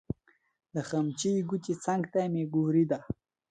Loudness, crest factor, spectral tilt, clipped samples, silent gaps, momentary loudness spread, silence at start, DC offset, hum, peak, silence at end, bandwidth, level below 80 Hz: -30 LUFS; 16 dB; -6.5 dB/octave; under 0.1%; none; 15 LU; 0.75 s; under 0.1%; none; -16 dBFS; 0.4 s; 9.6 kHz; -62 dBFS